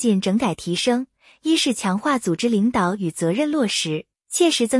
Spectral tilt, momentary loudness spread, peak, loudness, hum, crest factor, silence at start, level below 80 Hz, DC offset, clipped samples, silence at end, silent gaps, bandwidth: -4 dB/octave; 7 LU; -6 dBFS; -21 LUFS; none; 14 dB; 0 s; -58 dBFS; under 0.1%; under 0.1%; 0 s; none; 12 kHz